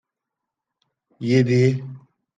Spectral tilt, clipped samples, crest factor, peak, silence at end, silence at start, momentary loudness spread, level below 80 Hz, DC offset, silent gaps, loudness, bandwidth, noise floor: -7.5 dB/octave; under 0.1%; 18 dB; -6 dBFS; 0.4 s; 1.2 s; 15 LU; -66 dBFS; under 0.1%; none; -20 LUFS; 7.6 kHz; -84 dBFS